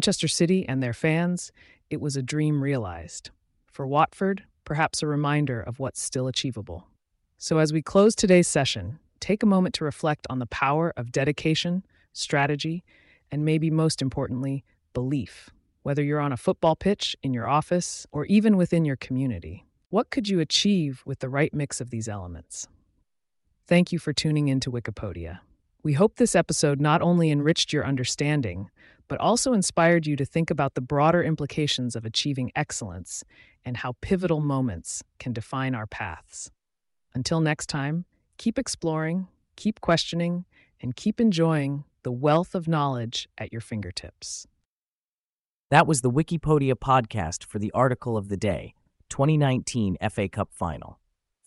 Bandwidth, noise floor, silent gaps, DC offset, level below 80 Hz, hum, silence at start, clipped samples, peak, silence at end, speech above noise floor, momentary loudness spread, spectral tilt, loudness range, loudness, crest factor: 11.5 kHz; under -90 dBFS; 19.86-19.90 s, 44.65-45.69 s; under 0.1%; -52 dBFS; none; 0 s; under 0.1%; -6 dBFS; 0.55 s; over 65 dB; 14 LU; -5 dB/octave; 6 LU; -25 LUFS; 20 dB